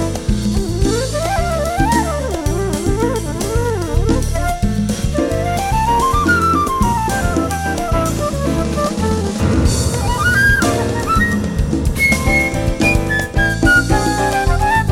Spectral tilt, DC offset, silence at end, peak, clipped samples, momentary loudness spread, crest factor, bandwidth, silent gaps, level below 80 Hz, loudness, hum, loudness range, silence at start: -5 dB/octave; under 0.1%; 0 s; -2 dBFS; under 0.1%; 6 LU; 14 dB; 17 kHz; none; -22 dBFS; -16 LUFS; none; 3 LU; 0 s